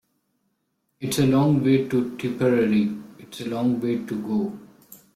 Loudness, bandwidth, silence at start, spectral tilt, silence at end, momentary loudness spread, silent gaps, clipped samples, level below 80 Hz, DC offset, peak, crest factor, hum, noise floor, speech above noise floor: -23 LUFS; 15 kHz; 1 s; -6.5 dB/octave; 0.2 s; 15 LU; none; under 0.1%; -60 dBFS; under 0.1%; -8 dBFS; 16 dB; none; -74 dBFS; 52 dB